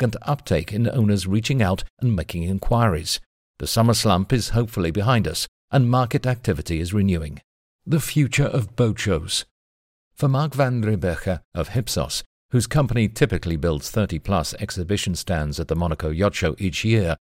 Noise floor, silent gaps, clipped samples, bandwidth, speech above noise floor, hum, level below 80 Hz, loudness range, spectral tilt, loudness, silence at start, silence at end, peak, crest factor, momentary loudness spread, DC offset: under -90 dBFS; 1.90-1.97 s, 3.26-3.54 s, 5.48-5.68 s, 7.44-7.79 s, 9.51-10.11 s, 11.45-11.52 s, 12.26-12.49 s; under 0.1%; 16 kHz; over 69 dB; none; -36 dBFS; 3 LU; -5.5 dB/octave; -22 LUFS; 0 s; 0.05 s; -2 dBFS; 18 dB; 7 LU; under 0.1%